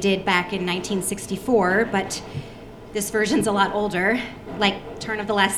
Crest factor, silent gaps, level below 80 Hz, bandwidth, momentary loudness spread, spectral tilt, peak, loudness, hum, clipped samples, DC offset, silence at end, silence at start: 20 dB; none; -48 dBFS; 16 kHz; 12 LU; -4 dB/octave; -2 dBFS; -22 LUFS; none; under 0.1%; under 0.1%; 0 s; 0 s